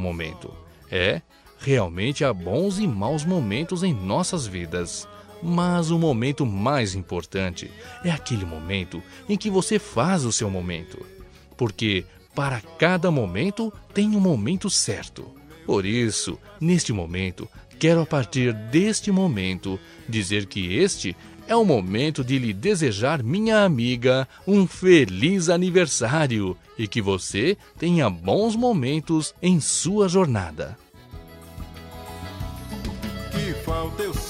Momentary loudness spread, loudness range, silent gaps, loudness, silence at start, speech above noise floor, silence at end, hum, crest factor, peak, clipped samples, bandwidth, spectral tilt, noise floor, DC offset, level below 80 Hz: 14 LU; 5 LU; none; -23 LUFS; 0 s; 20 dB; 0 s; none; 20 dB; -4 dBFS; under 0.1%; 15.5 kHz; -5 dB/octave; -43 dBFS; under 0.1%; -46 dBFS